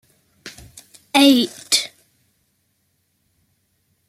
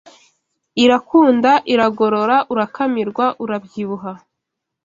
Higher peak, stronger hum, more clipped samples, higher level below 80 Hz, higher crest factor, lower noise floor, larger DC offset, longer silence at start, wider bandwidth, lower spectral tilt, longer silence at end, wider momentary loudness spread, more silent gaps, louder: about the same, -2 dBFS vs -2 dBFS; neither; neither; about the same, -62 dBFS vs -60 dBFS; about the same, 20 dB vs 16 dB; second, -68 dBFS vs -79 dBFS; neither; second, 0.45 s vs 0.75 s; first, 16 kHz vs 7.6 kHz; second, -1.5 dB/octave vs -5.5 dB/octave; first, 2.2 s vs 0.65 s; first, 26 LU vs 13 LU; neither; about the same, -16 LUFS vs -16 LUFS